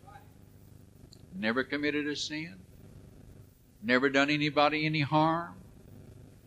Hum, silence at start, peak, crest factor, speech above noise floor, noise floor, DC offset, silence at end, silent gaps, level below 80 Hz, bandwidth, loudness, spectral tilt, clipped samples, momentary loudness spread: none; 0.05 s; -10 dBFS; 22 dB; 27 dB; -56 dBFS; under 0.1%; 0.2 s; none; -62 dBFS; 15.5 kHz; -29 LUFS; -5 dB/octave; under 0.1%; 14 LU